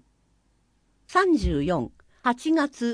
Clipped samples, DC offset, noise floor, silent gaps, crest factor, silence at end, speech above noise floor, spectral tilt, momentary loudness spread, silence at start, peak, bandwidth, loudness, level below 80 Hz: under 0.1%; under 0.1%; -66 dBFS; none; 18 dB; 0 s; 43 dB; -6 dB/octave; 7 LU; 1.1 s; -8 dBFS; 10.5 kHz; -24 LUFS; -40 dBFS